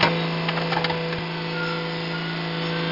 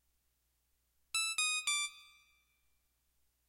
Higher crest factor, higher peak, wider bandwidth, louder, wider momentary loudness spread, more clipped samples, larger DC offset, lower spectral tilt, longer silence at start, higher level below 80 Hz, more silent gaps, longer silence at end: about the same, 18 dB vs 20 dB; first, -6 dBFS vs -22 dBFS; second, 5.8 kHz vs 16 kHz; first, -25 LUFS vs -34 LUFS; second, 4 LU vs 7 LU; neither; neither; first, -6.5 dB/octave vs 5.5 dB/octave; second, 0 s vs 1.15 s; first, -56 dBFS vs -82 dBFS; neither; second, 0 s vs 1.45 s